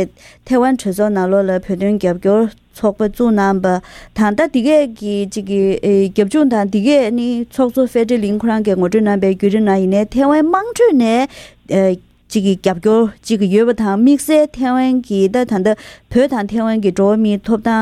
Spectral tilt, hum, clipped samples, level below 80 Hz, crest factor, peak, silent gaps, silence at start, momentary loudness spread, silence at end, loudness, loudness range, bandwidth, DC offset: -6.5 dB/octave; none; under 0.1%; -44 dBFS; 14 dB; 0 dBFS; none; 0 s; 6 LU; 0 s; -15 LUFS; 2 LU; 14.5 kHz; under 0.1%